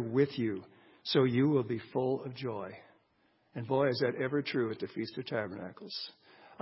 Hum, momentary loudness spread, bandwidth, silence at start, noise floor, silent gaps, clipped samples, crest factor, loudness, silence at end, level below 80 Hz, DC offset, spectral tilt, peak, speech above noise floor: none; 15 LU; 5.8 kHz; 0 s; -72 dBFS; none; under 0.1%; 20 dB; -33 LUFS; 0.1 s; -72 dBFS; under 0.1%; -10 dB/octave; -14 dBFS; 39 dB